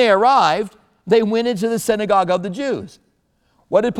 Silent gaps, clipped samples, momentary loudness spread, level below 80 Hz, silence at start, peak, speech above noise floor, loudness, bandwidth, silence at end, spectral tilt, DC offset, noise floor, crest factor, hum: none; under 0.1%; 11 LU; -56 dBFS; 0 s; -2 dBFS; 47 dB; -17 LUFS; 15 kHz; 0 s; -5 dB/octave; under 0.1%; -63 dBFS; 16 dB; none